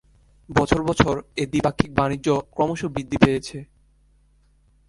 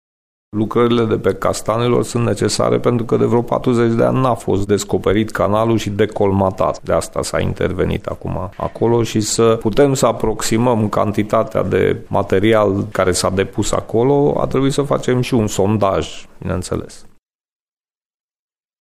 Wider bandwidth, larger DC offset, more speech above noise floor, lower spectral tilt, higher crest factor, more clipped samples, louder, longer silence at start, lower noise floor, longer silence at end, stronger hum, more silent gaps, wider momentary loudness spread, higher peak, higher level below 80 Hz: second, 11.5 kHz vs 15.5 kHz; neither; second, 37 dB vs over 74 dB; about the same, -6 dB/octave vs -5.5 dB/octave; first, 22 dB vs 16 dB; neither; second, -22 LUFS vs -16 LUFS; about the same, 0.5 s vs 0.55 s; second, -59 dBFS vs under -90 dBFS; second, 1.25 s vs 1.75 s; neither; neither; about the same, 8 LU vs 7 LU; about the same, 0 dBFS vs -2 dBFS; about the same, -42 dBFS vs -38 dBFS